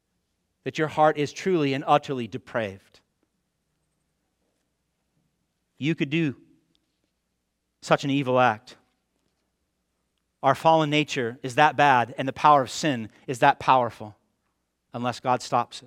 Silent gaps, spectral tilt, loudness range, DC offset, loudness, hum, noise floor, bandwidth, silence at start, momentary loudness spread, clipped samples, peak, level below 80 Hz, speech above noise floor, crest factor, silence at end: none; -5 dB/octave; 11 LU; under 0.1%; -23 LUFS; none; -77 dBFS; 15.5 kHz; 0.65 s; 13 LU; under 0.1%; -2 dBFS; -68 dBFS; 54 dB; 24 dB; 0.05 s